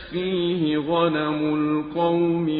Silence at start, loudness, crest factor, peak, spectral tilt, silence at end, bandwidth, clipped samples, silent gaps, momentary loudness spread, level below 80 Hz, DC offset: 0 s; -23 LUFS; 16 dB; -6 dBFS; -11 dB/octave; 0 s; 5 kHz; under 0.1%; none; 3 LU; -54 dBFS; under 0.1%